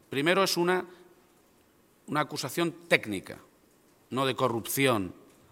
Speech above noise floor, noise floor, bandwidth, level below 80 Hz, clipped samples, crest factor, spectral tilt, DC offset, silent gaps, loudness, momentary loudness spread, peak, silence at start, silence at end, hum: 35 dB; -63 dBFS; 17 kHz; -72 dBFS; under 0.1%; 26 dB; -4 dB/octave; under 0.1%; none; -28 LUFS; 14 LU; -4 dBFS; 0.1 s; 0.4 s; none